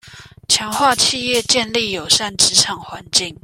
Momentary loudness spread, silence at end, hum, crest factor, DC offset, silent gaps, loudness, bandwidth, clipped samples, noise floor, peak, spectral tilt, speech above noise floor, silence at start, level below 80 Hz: 7 LU; 0.1 s; 50 Hz at -45 dBFS; 18 dB; under 0.1%; none; -15 LUFS; 16.5 kHz; under 0.1%; -38 dBFS; 0 dBFS; -1 dB/octave; 20 dB; 0.05 s; -50 dBFS